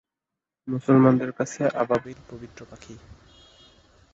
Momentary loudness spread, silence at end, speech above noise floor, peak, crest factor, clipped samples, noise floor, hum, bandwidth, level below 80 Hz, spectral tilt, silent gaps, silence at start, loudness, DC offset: 27 LU; 1.15 s; 63 dB; -4 dBFS; 20 dB; under 0.1%; -87 dBFS; none; 8 kHz; -58 dBFS; -7.5 dB/octave; none; 0.65 s; -22 LUFS; under 0.1%